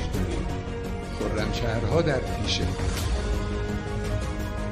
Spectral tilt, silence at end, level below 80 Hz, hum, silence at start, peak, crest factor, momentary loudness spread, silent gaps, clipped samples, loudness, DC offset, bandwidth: -5.5 dB/octave; 0 s; -32 dBFS; none; 0 s; -12 dBFS; 16 dB; 7 LU; none; under 0.1%; -28 LUFS; under 0.1%; 15 kHz